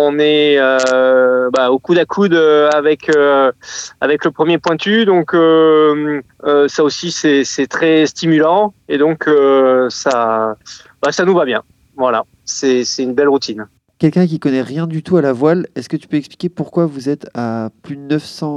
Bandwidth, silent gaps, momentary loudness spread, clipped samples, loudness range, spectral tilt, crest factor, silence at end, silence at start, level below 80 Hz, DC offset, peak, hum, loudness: 10 kHz; none; 11 LU; under 0.1%; 5 LU; -5 dB/octave; 12 dB; 0 s; 0 s; -60 dBFS; under 0.1%; 0 dBFS; none; -13 LUFS